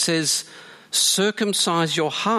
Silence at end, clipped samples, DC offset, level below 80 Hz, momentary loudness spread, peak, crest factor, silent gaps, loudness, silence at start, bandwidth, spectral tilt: 0 s; under 0.1%; under 0.1%; -72 dBFS; 6 LU; -6 dBFS; 16 dB; none; -20 LUFS; 0 s; 15.5 kHz; -2.5 dB/octave